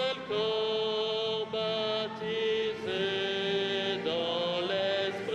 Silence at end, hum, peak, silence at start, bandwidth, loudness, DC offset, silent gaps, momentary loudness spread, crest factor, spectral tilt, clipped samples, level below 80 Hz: 0 s; none; -20 dBFS; 0 s; 9.2 kHz; -31 LUFS; under 0.1%; none; 2 LU; 12 dB; -4.5 dB/octave; under 0.1%; -72 dBFS